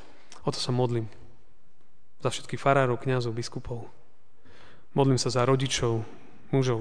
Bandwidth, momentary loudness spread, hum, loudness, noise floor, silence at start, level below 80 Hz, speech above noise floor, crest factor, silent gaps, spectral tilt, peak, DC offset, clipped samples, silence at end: 10 kHz; 12 LU; none; -27 LUFS; -66 dBFS; 0.35 s; -54 dBFS; 40 dB; 22 dB; none; -5.5 dB/octave; -6 dBFS; 1%; under 0.1%; 0 s